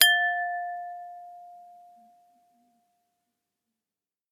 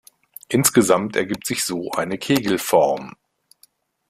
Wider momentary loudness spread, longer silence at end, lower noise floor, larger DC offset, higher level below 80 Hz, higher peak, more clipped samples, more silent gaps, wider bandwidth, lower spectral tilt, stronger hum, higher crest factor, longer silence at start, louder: first, 26 LU vs 9 LU; first, 2.65 s vs 1 s; first, under -90 dBFS vs -58 dBFS; neither; second, -88 dBFS vs -58 dBFS; about the same, 0 dBFS vs 0 dBFS; neither; neither; about the same, 16 kHz vs 16 kHz; second, 4 dB/octave vs -4 dB/octave; neither; first, 30 dB vs 22 dB; second, 0 s vs 0.5 s; second, -26 LUFS vs -20 LUFS